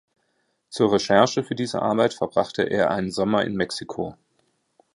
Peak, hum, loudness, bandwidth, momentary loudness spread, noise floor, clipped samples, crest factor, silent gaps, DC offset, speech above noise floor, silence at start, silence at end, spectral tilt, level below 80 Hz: -2 dBFS; none; -23 LUFS; 11.5 kHz; 12 LU; -71 dBFS; under 0.1%; 22 dB; none; under 0.1%; 49 dB; 0.7 s; 0.85 s; -5 dB/octave; -58 dBFS